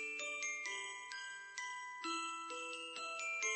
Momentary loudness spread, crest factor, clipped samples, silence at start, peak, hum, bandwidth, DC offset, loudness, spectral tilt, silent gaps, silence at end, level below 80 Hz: 6 LU; 18 dB; under 0.1%; 0 s; -26 dBFS; none; 9 kHz; under 0.1%; -43 LUFS; 1.5 dB/octave; none; 0 s; under -90 dBFS